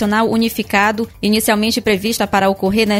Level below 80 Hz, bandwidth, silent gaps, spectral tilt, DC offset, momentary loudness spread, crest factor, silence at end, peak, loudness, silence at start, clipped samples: -42 dBFS; 16.5 kHz; none; -4 dB/octave; under 0.1%; 3 LU; 14 dB; 0 s; 0 dBFS; -15 LUFS; 0 s; under 0.1%